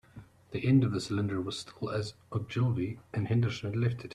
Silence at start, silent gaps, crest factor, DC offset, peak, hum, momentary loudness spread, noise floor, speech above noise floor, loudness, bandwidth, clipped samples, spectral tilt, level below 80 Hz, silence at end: 0.15 s; none; 18 dB; under 0.1%; -14 dBFS; none; 11 LU; -53 dBFS; 23 dB; -32 LUFS; 11 kHz; under 0.1%; -7 dB/octave; -62 dBFS; 0 s